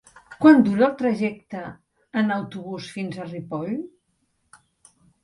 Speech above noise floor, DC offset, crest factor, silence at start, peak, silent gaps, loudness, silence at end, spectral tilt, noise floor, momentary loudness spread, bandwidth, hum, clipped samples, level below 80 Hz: 49 dB; under 0.1%; 20 dB; 0.3 s; -2 dBFS; none; -22 LUFS; 1.35 s; -7.5 dB/octave; -70 dBFS; 20 LU; 11.5 kHz; none; under 0.1%; -64 dBFS